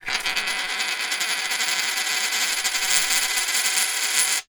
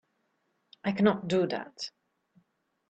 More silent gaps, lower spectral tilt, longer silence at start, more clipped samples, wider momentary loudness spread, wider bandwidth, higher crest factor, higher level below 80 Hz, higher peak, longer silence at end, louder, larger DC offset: neither; second, 3 dB/octave vs -6.5 dB/octave; second, 0 s vs 0.85 s; neither; second, 4 LU vs 14 LU; first, over 20 kHz vs 8.4 kHz; about the same, 22 dB vs 22 dB; first, -58 dBFS vs -72 dBFS; first, 0 dBFS vs -10 dBFS; second, 0.1 s vs 1 s; first, -21 LUFS vs -30 LUFS; neither